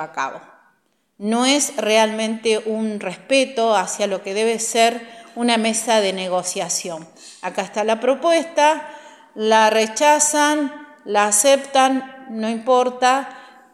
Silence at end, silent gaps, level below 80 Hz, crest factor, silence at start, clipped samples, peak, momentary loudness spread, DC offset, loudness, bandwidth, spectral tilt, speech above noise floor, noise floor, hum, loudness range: 0.25 s; none; -78 dBFS; 18 dB; 0 s; under 0.1%; -2 dBFS; 13 LU; under 0.1%; -18 LUFS; 15.5 kHz; -2 dB/octave; 46 dB; -64 dBFS; none; 4 LU